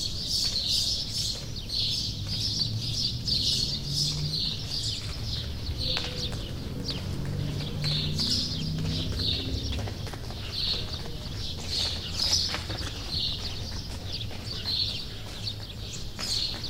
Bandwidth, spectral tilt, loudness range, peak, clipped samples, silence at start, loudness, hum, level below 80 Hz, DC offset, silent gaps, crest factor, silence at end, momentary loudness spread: 16 kHz; -3 dB/octave; 5 LU; -12 dBFS; under 0.1%; 0 s; -29 LUFS; none; -40 dBFS; under 0.1%; none; 20 dB; 0 s; 10 LU